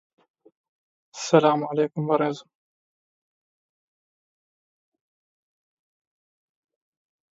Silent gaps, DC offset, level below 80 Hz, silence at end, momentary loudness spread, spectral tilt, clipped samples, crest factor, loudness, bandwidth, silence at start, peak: none; under 0.1%; -78 dBFS; 5 s; 17 LU; -5.5 dB/octave; under 0.1%; 26 dB; -23 LUFS; 7.8 kHz; 1.15 s; -2 dBFS